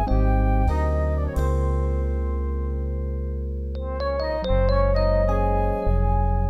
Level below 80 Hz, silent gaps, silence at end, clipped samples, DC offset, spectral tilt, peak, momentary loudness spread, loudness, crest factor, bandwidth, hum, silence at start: -24 dBFS; none; 0 s; under 0.1%; under 0.1%; -8.5 dB/octave; -10 dBFS; 8 LU; -24 LUFS; 12 dB; 7.4 kHz; none; 0 s